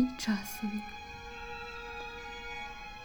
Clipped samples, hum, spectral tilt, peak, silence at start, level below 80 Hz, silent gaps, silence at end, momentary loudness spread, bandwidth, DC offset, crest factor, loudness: under 0.1%; none; -4 dB/octave; -18 dBFS; 0 s; -54 dBFS; none; 0 s; 10 LU; over 20 kHz; under 0.1%; 20 dB; -39 LUFS